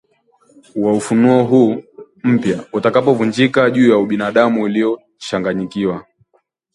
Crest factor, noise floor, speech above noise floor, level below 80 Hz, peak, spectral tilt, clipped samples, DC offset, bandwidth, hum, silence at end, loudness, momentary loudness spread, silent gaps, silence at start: 16 dB; -62 dBFS; 48 dB; -56 dBFS; 0 dBFS; -6.5 dB/octave; under 0.1%; under 0.1%; 11.5 kHz; none; 0.75 s; -15 LUFS; 10 LU; none; 0.75 s